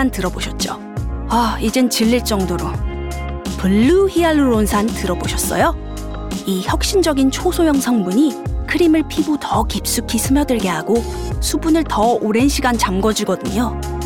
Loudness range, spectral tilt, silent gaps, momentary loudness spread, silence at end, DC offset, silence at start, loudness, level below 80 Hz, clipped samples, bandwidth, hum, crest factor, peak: 2 LU; -5 dB/octave; none; 10 LU; 0 s; under 0.1%; 0 s; -17 LUFS; -28 dBFS; under 0.1%; 19 kHz; none; 14 dB; -2 dBFS